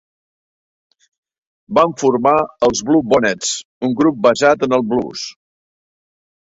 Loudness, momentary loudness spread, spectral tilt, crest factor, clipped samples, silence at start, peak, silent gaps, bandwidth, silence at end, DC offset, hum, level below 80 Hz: -15 LUFS; 8 LU; -4 dB/octave; 16 dB; under 0.1%; 1.7 s; 0 dBFS; 3.65-3.81 s; 8 kHz; 1.2 s; under 0.1%; none; -54 dBFS